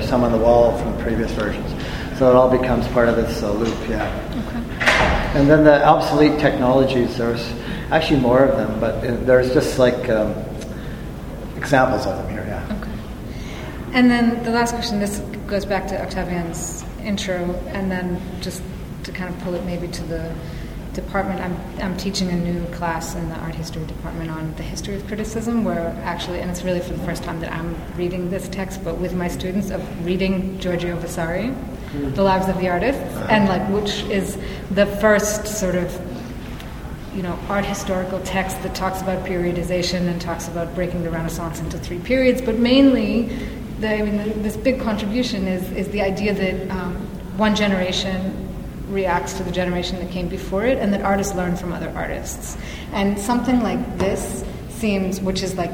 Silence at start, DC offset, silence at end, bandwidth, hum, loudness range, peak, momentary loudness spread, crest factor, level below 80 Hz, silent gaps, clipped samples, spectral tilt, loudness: 0 s; under 0.1%; 0 s; 18 kHz; none; 9 LU; 0 dBFS; 13 LU; 20 dB; -34 dBFS; none; under 0.1%; -5.5 dB/octave; -21 LUFS